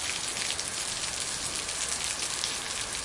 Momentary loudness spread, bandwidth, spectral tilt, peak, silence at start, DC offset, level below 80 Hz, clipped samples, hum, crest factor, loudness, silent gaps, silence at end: 1 LU; 11.5 kHz; 0 dB/octave; -10 dBFS; 0 s; under 0.1%; -54 dBFS; under 0.1%; none; 24 dB; -30 LUFS; none; 0 s